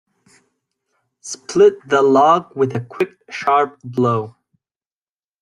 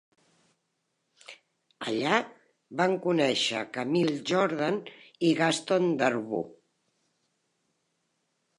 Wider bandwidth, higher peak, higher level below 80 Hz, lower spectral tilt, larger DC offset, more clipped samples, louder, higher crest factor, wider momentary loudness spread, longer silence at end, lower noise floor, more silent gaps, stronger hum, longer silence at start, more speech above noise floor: about the same, 11 kHz vs 11.5 kHz; first, -2 dBFS vs -8 dBFS; first, -64 dBFS vs -80 dBFS; about the same, -5.5 dB/octave vs -4.5 dB/octave; neither; neither; first, -17 LUFS vs -27 LUFS; second, 16 dB vs 22 dB; first, 16 LU vs 11 LU; second, 1.15 s vs 2.05 s; first, under -90 dBFS vs -79 dBFS; neither; neither; about the same, 1.25 s vs 1.3 s; first, over 74 dB vs 51 dB